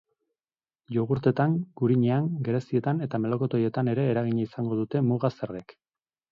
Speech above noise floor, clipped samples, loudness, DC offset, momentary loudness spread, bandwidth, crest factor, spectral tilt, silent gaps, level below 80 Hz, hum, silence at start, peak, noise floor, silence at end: over 64 dB; under 0.1%; -27 LUFS; under 0.1%; 6 LU; 6.8 kHz; 18 dB; -10 dB/octave; none; -64 dBFS; none; 0.9 s; -10 dBFS; under -90 dBFS; 0.7 s